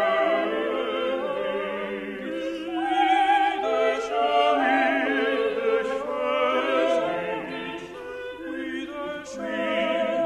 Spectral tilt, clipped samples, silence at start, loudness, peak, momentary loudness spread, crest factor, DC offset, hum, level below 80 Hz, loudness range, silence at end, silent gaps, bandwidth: -4 dB/octave; under 0.1%; 0 s; -25 LUFS; -8 dBFS; 12 LU; 16 dB; under 0.1%; none; -62 dBFS; 6 LU; 0 s; none; 12.5 kHz